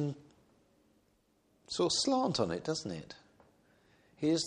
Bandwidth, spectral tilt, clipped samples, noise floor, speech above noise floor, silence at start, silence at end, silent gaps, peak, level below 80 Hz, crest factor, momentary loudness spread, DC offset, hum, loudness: 10.5 kHz; -4.5 dB/octave; under 0.1%; -72 dBFS; 39 dB; 0 s; 0 s; none; -16 dBFS; -68 dBFS; 20 dB; 21 LU; under 0.1%; none; -34 LUFS